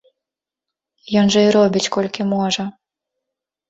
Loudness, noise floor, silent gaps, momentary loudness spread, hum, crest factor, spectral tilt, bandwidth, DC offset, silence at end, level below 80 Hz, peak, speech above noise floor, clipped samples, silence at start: -17 LUFS; -86 dBFS; none; 8 LU; none; 16 dB; -5 dB/octave; 8 kHz; under 0.1%; 1 s; -58 dBFS; -4 dBFS; 70 dB; under 0.1%; 1.05 s